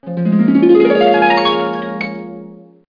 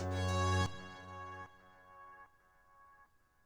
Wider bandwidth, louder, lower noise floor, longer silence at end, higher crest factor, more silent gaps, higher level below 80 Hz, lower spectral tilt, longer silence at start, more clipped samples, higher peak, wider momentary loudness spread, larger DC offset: second, 5.2 kHz vs 11.5 kHz; first, -12 LUFS vs -38 LUFS; second, -36 dBFS vs -68 dBFS; about the same, 0.35 s vs 0.45 s; second, 12 dB vs 20 dB; neither; first, -56 dBFS vs -62 dBFS; first, -8 dB/octave vs -5 dB/octave; about the same, 0 s vs 0 s; neither; first, -2 dBFS vs -22 dBFS; second, 17 LU vs 25 LU; neither